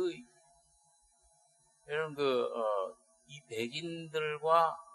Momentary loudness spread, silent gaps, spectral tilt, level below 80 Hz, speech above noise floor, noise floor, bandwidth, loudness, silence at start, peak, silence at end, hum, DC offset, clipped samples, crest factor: 15 LU; none; -4.5 dB/octave; -82 dBFS; 36 dB; -69 dBFS; 12.5 kHz; -34 LUFS; 0 s; -14 dBFS; 0 s; none; under 0.1%; under 0.1%; 22 dB